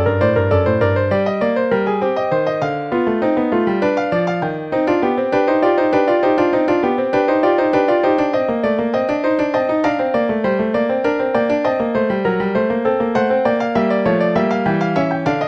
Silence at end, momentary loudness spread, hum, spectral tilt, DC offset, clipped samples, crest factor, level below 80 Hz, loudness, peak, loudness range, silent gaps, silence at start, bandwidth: 0 s; 3 LU; none; -8 dB/octave; under 0.1%; under 0.1%; 14 dB; -50 dBFS; -17 LUFS; -2 dBFS; 2 LU; none; 0 s; 7.6 kHz